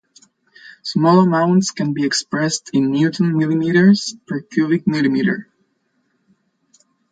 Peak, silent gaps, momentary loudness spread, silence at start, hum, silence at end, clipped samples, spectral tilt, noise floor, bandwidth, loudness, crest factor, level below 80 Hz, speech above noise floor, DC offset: -2 dBFS; none; 10 LU; 0.65 s; none; 1.7 s; under 0.1%; -5.5 dB/octave; -66 dBFS; 9.4 kHz; -17 LUFS; 16 dB; -62 dBFS; 50 dB; under 0.1%